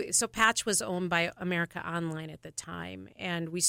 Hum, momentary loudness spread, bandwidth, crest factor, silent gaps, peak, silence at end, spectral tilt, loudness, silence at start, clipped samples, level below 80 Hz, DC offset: none; 15 LU; 16.5 kHz; 22 dB; none; -8 dBFS; 0 s; -2.5 dB/octave; -30 LUFS; 0 s; under 0.1%; -62 dBFS; under 0.1%